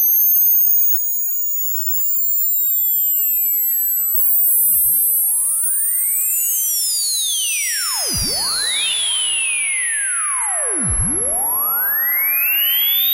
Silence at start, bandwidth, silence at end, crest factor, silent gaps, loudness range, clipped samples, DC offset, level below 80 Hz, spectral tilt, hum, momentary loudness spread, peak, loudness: 0 s; 16.5 kHz; 0 s; 12 dB; none; 3 LU; under 0.1%; under 0.1%; -42 dBFS; 0.5 dB/octave; none; 6 LU; -6 dBFS; -14 LUFS